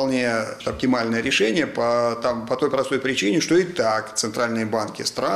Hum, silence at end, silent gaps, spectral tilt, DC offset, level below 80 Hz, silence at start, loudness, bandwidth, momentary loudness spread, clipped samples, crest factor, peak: none; 0 s; none; -4 dB/octave; under 0.1%; -54 dBFS; 0 s; -22 LUFS; 14 kHz; 6 LU; under 0.1%; 14 dB; -8 dBFS